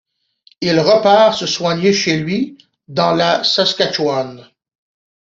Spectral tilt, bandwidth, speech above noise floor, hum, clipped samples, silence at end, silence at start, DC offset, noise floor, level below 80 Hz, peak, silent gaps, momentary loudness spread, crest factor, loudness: -4.5 dB/octave; 7.8 kHz; 39 dB; none; under 0.1%; 0.85 s; 0.6 s; under 0.1%; -54 dBFS; -58 dBFS; 0 dBFS; none; 11 LU; 16 dB; -14 LUFS